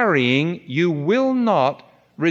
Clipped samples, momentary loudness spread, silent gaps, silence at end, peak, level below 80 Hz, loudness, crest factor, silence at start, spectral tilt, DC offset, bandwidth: under 0.1%; 6 LU; none; 0 s; -4 dBFS; -72 dBFS; -19 LUFS; 16 dB; 0 s; -7 dB/octave; under 0.1%; 7.6 kHz